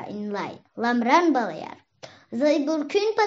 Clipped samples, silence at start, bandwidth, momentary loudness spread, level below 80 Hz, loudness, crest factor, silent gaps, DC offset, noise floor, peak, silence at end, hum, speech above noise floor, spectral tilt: under 0.1%; 0 s; 7.8 kHz; 16 LU; -82 dBFS; -23 LUFS; 20 dB; none; under 0.1%; -46 dBFS; -4 dBFS; 0 s; none; 23 dB; -3 dB/octave